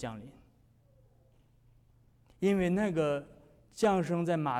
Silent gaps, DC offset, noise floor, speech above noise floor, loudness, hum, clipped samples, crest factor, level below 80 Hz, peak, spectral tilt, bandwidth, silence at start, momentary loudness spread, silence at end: none; under 0.1%; -64 dBFS; 34 dB; -31 LUFS; none; under 0.1%; 16 dB; -62 dBFS; -18 dBFS; -7 dB/octave; 13.5 kHz; 0 s; 14 LU; 0 s